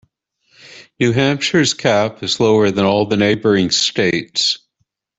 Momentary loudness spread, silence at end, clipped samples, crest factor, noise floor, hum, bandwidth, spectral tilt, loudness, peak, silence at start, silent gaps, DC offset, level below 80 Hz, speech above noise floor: 4 LU; 0.6 s; under 0.1%; 14 dB; -69 dBFS; none; 8.4 kHz; -4 dB/octave; -15 LUFS; -2 dBFS; 0.75 s; none; under 0.1%; -54 dBFS; 54 dB